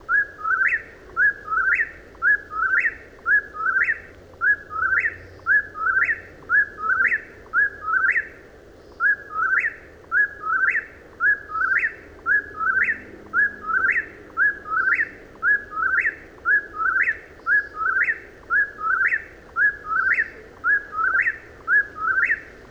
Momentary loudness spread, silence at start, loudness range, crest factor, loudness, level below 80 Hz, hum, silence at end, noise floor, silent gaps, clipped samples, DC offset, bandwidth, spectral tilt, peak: 7 LU; 0 s; 1 LU; 14 dB; -21 LUFS; -52 dBFS; none; 0.05 s; -46 dBFS; none; under 0.1%; under 0.1%; 8.2 kHz; -4.5 dB/octave; -10 dBFS